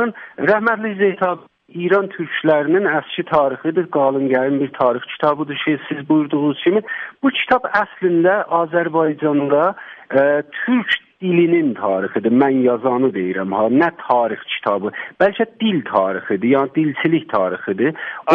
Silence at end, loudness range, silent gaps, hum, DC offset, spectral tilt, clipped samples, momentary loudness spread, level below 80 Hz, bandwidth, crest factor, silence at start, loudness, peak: 0 s; 1 LU; none; none; under 0.1%; -8.5 dB/octave; under 0.1%; 6 LU; -62 dBFS; 5.4 kHz; 16 dB; 0 s; -18 LUFS; 0 dBFS